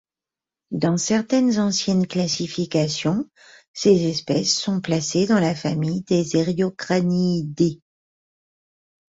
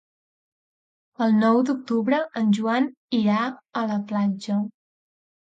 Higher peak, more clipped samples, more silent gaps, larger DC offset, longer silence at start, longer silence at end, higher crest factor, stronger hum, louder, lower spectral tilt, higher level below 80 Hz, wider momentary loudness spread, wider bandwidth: first, -4 dBFS vs -8 dBFS; neither; about the same, 3.68-3.74 s vs 2.97-3.08 s; neither; second, 0.7 s vs 1.2 s; first, 1.35 s vs 0.75 s; about the same, 18 dB vs 16 dB; neither; about the same, -21 LUFS vs -23 LUFS; second, -5 dB/octave vs -7 dB/octave; first, -58 dBFS vs -74 dBFS; about the same, 6 LU vs 7 LU; about the same, 8 kHz vs 7.8 kHz